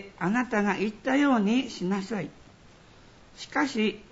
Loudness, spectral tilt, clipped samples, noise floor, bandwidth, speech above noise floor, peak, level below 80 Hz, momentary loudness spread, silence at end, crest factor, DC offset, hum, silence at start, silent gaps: -27 LUFS; -5.5 dB/octave; under 0.1%; -53 dBFS; 8 kHz; 27 dB; -12 dBFS; -60 dBFS; 11 LU; 0.1 s; 16 dB; under 0.1%; none; 0 s; none